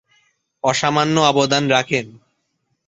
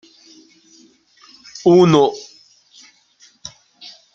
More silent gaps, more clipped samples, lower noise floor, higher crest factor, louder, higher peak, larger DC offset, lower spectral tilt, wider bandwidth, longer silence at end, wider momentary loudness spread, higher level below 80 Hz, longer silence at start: neither; neither; first, -71 dBFS vs -53 dBFS; about the same, 18 dB vs 18 dB; second, -17 LUFS vs -14 LUFS; about the same, -2 dBFS vs -2 dBFS; neither; second, -4 dB/octave vs -6.5 dB/octave; first, 8.4 kHz vs 7.4 kHz; second, 0.75 s vs 1.95 s; second, 8 LU vs 28 LU; about the same, -58 dBFS vs -62 dBFS; second, 0.65 s vs 1.65 s